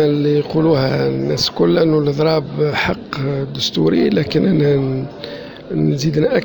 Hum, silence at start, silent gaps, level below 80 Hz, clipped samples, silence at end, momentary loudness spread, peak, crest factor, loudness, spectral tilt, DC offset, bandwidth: none; 0 s; none; -44 dBFS; under 0.1%; 0 s; 8 LU; -2 dBFS; 14 dB; -16 LUFS; -6.5 dB/octave; under 0.1%; 19.5 kHz